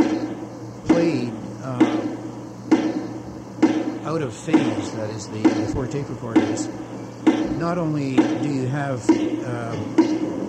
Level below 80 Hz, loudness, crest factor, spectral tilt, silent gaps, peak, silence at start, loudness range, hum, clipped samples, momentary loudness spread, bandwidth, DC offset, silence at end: -50 dBFS; -22 LUFS; 18 dB; -6.5 dB/octave; none; -4 dBFS; 0 s; 2 LU; none; under 0.1%; 12 LU; 9 kHz; under 0.1%; 0 s